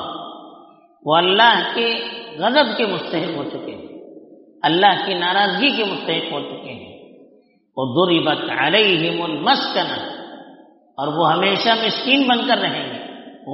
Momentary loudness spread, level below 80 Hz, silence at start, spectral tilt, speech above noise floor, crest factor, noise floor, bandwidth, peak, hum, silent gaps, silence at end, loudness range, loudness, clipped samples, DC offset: 19 LU; -66 dBFS; 0 s; -1.5 dB/octave; 36 dB; 20 dB; -54 dBFS; 6 kHz; 0 dBFS; none; none; 0 s; 3 LU; -17 LUFS; under 0.1%; under 0.1%